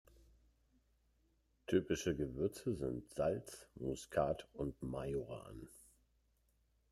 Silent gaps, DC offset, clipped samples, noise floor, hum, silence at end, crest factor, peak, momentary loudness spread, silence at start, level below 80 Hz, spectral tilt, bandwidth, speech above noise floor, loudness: none; under 0.1%; under 0.1%; -77 dBFS; none; 1.1 s; 22 dB; -22 dBFS; 15 LU; 1.7 s; -62 dBFS; -6 dB/octave; 13.5 kHz; 37 dB; -41 LUFS